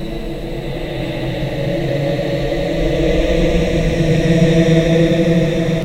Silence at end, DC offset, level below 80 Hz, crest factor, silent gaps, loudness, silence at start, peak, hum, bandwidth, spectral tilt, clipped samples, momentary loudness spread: 0 s; under 0.1%; -24 dBFS; 14 dB; none; -16 LUFS; 0 s; 0 dBFS; none; 15 kHz; -7 dB/octave; under 0.1%; 11 LU